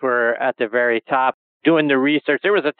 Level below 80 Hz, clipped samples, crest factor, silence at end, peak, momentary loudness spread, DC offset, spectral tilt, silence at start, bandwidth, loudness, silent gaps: under -90 dBFS; under 0.1%; 16 dB; 0.1 s; -2 dBFS; 5 LU; under 0.1%; -2.5 dB/octave; 0 s; 4.5 kHz; -18 LUFS; 1.34-1.60 s